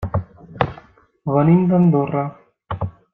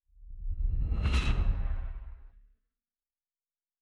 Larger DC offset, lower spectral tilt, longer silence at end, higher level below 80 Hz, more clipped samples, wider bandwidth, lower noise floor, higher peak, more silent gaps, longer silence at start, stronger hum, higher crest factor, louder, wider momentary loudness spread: neither; first, -11 dB/octave vs -6 dB/octave; second, 0.25 s vs 1.55 s; second, -44 dBFS vs -32 dBFS; neither; second, 4 kHz vs 10 kHz; second, -47 dBFS vs under -90 dBFS; first, -2 dBFS vs -16 dBFS; neither; second, 0 s vs 0.2 s; neither; about the same, 18 dB vs 16 dB; first, -19 LUFS vs -34 LUFS; about the same, 16 LU vs 18 LU